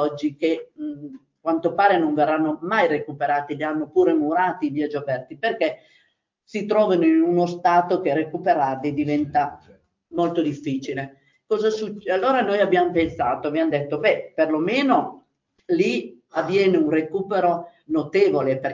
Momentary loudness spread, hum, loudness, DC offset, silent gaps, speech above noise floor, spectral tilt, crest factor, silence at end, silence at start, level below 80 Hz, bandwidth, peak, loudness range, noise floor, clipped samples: 10 LU; none; -22 LUFS; under 0.1%; none; 45 dB; -7 dB/octave; 16 dB; 0 s; 0 s; -60 dBFS; 7.6 kHz; -4 dBFS; 3 LU; -66 dBFS; under 0.1%